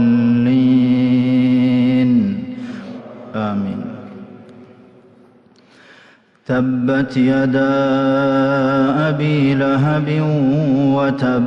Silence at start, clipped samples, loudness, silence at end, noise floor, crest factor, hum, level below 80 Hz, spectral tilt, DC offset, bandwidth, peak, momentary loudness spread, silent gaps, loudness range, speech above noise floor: 0 s; under 0.1%; -15 LUFS; 0 s; -49 dBFS; 10 dB; none; -52 dBFS; -9 dB/octave; under 0.1%; 6.2 kHz; -6 dBFS; 15 LU; none; 13 LU; 34 dB